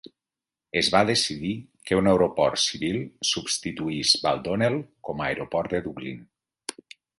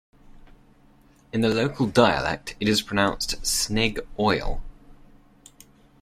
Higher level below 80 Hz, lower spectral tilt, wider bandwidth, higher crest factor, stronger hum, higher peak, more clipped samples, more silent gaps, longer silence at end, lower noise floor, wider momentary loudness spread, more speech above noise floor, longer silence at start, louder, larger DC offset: second, -54 dBFS vs -40 dBFS; about the same, -3.5 dB/octave vs -4 dB/octave; second, 11.5 kHz vs 16 kHz; about the same, 22 dB vs 22 dB; neither; about the same, -4 dBFS vs -2 dBFS; neither; neither; second, 0.45 s vs 1.1 s; first, -90 dBFS vs -55 dBFS; first, 16 LU vs 8 LU; first, 65 dB vs 32 dB; first, 0.75 s vs 0.25 s; about the same, -24 LUFS vs -23 LUFS; neither